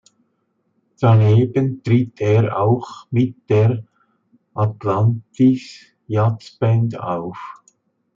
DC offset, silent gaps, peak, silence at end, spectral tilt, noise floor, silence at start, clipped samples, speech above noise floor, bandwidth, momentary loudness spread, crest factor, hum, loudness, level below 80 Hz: under 0.1%; none; -4 dBFS; 0.65 s; -9 dB/octave; -68 dBFS; 1 s; under 0.1%; 51 dB; 7.2 kHz; 11 LU; 14 dB; none; -18 LUFS; -60 dBFS